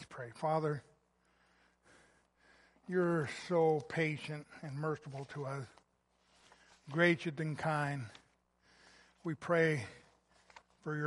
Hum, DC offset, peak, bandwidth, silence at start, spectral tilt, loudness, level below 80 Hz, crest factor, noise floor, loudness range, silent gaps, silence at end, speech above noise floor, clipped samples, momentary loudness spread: none; under 0.1%; -16 dBFS; 11.5 kHz; 0 s; -6.5 dB/octave; -36 LUFS; -76 dBFS; 22 dB; -75 dBFS; 3 LU; none; 0 s; 40 dB; under 0.1%; 15 LU